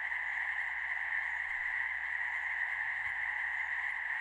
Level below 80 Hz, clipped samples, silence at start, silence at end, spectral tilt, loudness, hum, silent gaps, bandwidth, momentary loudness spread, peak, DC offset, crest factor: -68 dBFS; under 0.1%; 0 s; 0 s; -1 dB/octave; -34 LUFS; none; none; 11.5 kHz; 1 LU; -24 dBFS; under 0.1%; 12 dB